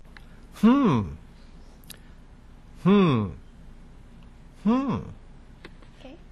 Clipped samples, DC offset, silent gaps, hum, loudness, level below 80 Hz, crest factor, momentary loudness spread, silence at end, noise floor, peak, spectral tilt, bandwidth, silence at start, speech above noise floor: under 0.1%; under 0.1%; none; none; -23 LUFS; -46 dBFS; 20 dB; 27 LU; 0.15 s; -48 dBFS; -8 dBFS; -8 dB/octave; 13 kHz; 0.15 s; 28 dB